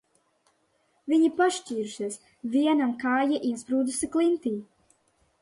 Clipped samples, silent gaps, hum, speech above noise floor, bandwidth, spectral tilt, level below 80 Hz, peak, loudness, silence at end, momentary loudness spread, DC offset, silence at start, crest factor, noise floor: under 0.1%; none; none; 44 dB; 11.5 kHz; -3.5 dB/octave; -68 dBFS; -12 dBFS; -26 LUFS; 0.8 s; 12 LU; under 0.1%; 1.05 s; 16 dB; -70 dBFS